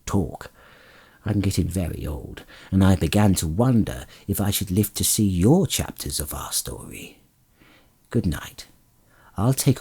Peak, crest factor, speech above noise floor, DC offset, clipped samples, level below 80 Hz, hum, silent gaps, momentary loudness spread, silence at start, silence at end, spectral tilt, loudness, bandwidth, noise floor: -4 dBFS; 20 dB; 35 dB; under 0.1%; under 0.1%; -42 dBFS; none; none; 19 LU; 0.05 s; 0 s; -5.5 dB/octave; -23 LUFS; over 20 kHz; -57 dBFS